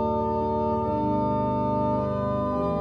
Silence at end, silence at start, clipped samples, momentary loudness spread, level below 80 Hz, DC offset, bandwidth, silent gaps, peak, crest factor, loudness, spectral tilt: 0 s; 0 s; under 0.1%; 1 LU; -44 dBFS; under 0.1%; 6.4 kHz; none; -14 dBFS; 12 dB; -26 LUFS; -10 dB/octave